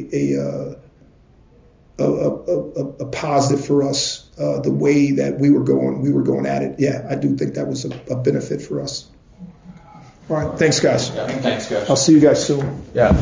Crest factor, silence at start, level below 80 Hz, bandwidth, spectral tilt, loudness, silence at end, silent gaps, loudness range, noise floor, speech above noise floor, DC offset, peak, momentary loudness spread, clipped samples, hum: 16 dB; 0 s; -38 dBFS; 7.6 kHz; -5.5 dB/octave; -19 LUFS; 0 s; none; 7 LU; -50 dBFS; 32 dB; under 0.1%; -2 dBFS; 11 LU; under 0.1%; none